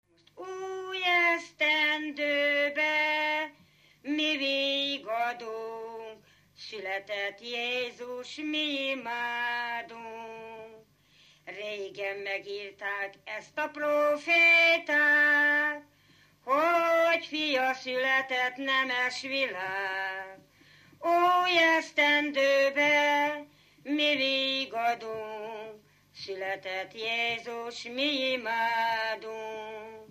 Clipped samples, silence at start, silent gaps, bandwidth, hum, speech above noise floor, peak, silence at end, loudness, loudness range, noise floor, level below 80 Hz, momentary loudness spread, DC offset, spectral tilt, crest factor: under 0.1%; 0.35 s; none; 15 kHz; 50 Hz at -70 dBFS; 33 dB; -12 dBFS; 0.05 s; -27 LUFS; 11 LU; -62 dBFS; -78 dBFS; 17 LU; under 0.1%; -2 dB/octave; 16 dB